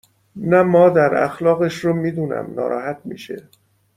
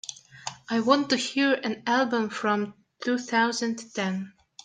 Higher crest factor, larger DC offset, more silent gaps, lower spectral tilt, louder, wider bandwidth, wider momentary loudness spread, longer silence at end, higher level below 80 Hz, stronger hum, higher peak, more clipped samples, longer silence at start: about the same, 16 dB vs 20 dB; neither; neither; first, -7.5 dB/octave vs -4 dB/octave; first, -17 LUFS vs -26 LUFS; first, 13.5 kHz vs 9.4 kHz; first, 18 LU vs 15 LU; first, 0.55 s vs 0.35 s; first, -58 dBFS vs -74 dBFS; neither; first, -2 dBFS vs -6 dBFS; neither; first, 0.35 s vs 0.05 s